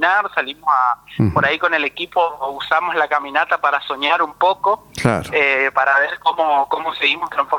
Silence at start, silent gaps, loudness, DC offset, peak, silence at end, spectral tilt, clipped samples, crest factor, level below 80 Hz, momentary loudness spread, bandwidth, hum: 0 s; none; -17 LUFS; under 0.1%; 0 dBFS; 0 s; -5 dB/octave; under 0.1%; 18 dB; -50 dBFS; 5 LU; 19 kHz; none